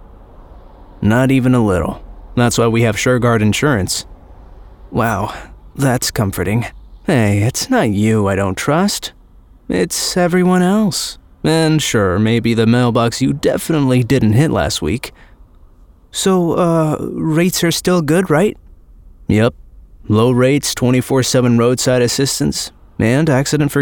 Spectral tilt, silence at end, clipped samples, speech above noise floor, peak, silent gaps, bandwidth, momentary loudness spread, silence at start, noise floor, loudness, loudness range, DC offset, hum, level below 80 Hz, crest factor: -5.5 dB/octave; 0 s; under 0.1%; 30 dB; -2 dBFS; none; 19.5 kHz; 9 LU; 0 s; -44 dBFS; -15 LUFS; 3 LU; under 0.1%; none; -38 dBFS; 14 dB